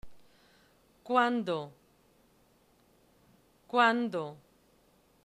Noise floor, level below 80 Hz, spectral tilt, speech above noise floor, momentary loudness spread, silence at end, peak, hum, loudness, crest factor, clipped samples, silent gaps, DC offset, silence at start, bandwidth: -66 dBFS; -70 dBFS; -5.5 dB/octave; 37 dB; 14 LU; 0.9 s; -12 dBFS; none; -30 LUFS; 22 dB; under 0.1%; none; under 0.1%; 0.05 s; 13 kHz